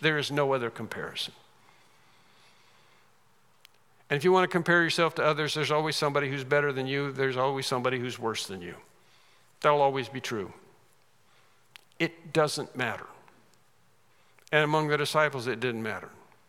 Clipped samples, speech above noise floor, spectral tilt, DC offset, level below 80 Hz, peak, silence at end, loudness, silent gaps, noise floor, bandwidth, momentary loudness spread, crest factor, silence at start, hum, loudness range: under 0.1%; 39 dB; -4.5 dB/octave; under 0.1%; -80 dBFS; -6 dBFS; 0.35 s; -28 LUFS; none; -66 dBFS; 16.5 kHz; 13 LU; 24 dB; 0 s; none; 8 LU